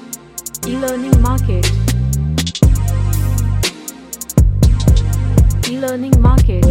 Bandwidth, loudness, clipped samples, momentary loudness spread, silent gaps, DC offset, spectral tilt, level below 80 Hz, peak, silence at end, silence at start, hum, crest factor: 17 kHz; -15 LUFS; under 0.1%; 11 LU; none; under 0.1%; -6 dB/octave; -16 dBFS; 0 dBFS; 0 s; 0.05 s; none; 12 dB